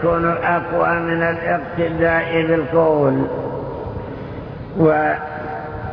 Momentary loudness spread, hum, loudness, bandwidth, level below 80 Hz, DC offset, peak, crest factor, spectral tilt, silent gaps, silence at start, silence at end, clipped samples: 13 LU; none; -19 LUFS; 5.4 kHz; -40 dBFS; under 0.1%; -2 dBFS; 18 dB; -10 dB/octave; none; 0 s; 0 s; under 0.1%